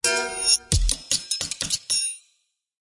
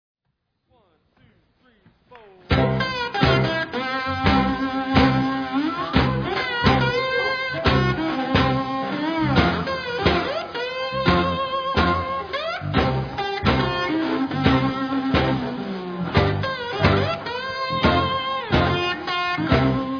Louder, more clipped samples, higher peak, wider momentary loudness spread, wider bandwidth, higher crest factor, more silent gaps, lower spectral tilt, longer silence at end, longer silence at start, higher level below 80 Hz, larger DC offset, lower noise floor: about the same, -22 LUFS vs -22 LUFS; neither; about the same, -4 dBFS vs -4 dBFS; about the same, 7 LU vs 7 LU; first, 11.5 kHz vs 5.4 kHz; about the same, 20 dB vs 18 dB; neither; second, -1 dB/octave vs -7 dB/octave; first, 0.65 s vs 0 s; second, 0.05 s vs 2.1 s; about the same, -32 dBFS vs -36 dBFS; neither; second, -70 dBFS vs -75 dBFS